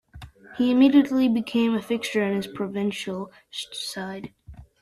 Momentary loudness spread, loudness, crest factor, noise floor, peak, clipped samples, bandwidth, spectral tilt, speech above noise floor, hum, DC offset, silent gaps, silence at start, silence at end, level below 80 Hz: 18 LU; -23 LUFS; 18 dB; -45 dBFS; -6 dBFS; under 0.1%; 13 kHz; -5.5 dB/octave; 22 dB; none; under 0.1%; none; 0.15 s; 0.2 s; -56 dBFS